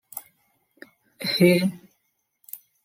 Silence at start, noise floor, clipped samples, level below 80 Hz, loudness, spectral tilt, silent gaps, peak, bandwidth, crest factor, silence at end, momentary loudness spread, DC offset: 0.15 s; -74 dBFS; under 0.1%; -68 dBFS; -21 LUFS; -5.5 dB/octave; none; -4 dBFS; 16.5 kHz; 22 dB; 0.3 s; 23 LU; under 0.1%